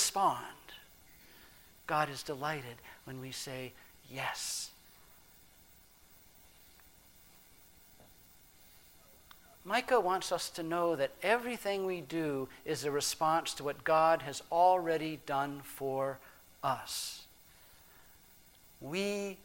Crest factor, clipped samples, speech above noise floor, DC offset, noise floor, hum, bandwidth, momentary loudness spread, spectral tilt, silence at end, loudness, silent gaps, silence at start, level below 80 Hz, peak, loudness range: 22 dB; under 0.1%; 27 dB; under 0.1%; -61 dBFS; none; 17 kHz; 20 LU; -3 dB/octave; 0 s; -34 LUFS; none; 0 s; -68 dBFS; -14 dBFS; 11 LU